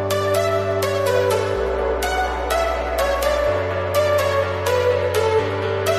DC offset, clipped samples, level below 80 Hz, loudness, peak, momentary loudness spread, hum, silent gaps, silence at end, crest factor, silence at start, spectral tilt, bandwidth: under 0.1%; under 0.1%; -34 dBFS; -20 LUFS; -6 dBFS; 3 LU; none; none; 0 s; 12 dB; 0 s; -4.5 dB/octave; 15.5 kHz